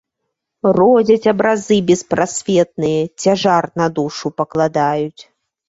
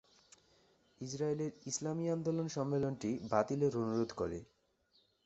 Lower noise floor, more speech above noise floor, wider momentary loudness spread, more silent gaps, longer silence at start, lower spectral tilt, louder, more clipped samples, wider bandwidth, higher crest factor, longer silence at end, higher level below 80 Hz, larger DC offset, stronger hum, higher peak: about the same, -76 dBFS vs -74 dBFS; first, 61 dB vs 38 dB; about the same, 9 LU vs 7 LU; neither; second, 0.65 s vs 1 s; second, -5.5 dB/octave vs -7 dB/octave; first, -15 LUFS vs -37 LUFS; neither; about the same, 8 kHz vs 8 kHz; second, 14 dB vs 22 dB; second, 0.45 s vs 0.8 s; first, -54 dBFS vs -68 dBFS; neither; neither; first, -2 dBFS vs -16 dBFS